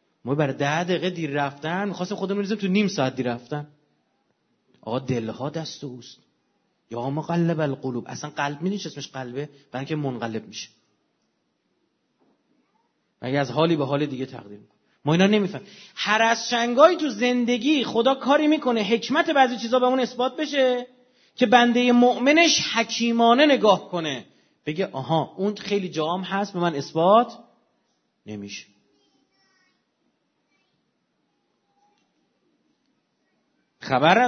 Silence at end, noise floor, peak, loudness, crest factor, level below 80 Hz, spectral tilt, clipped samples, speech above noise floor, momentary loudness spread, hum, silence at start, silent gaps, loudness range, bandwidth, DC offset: 0 s; -72 dBFS; -2 dBFS; -22 LUFS; 22 dB; -72 dBFS; -5 dB/octave; under 0.1%; 50 dB; 17 LU; none; 0.25 s; none; 14 LU; 6.6 kHz; under 0.1%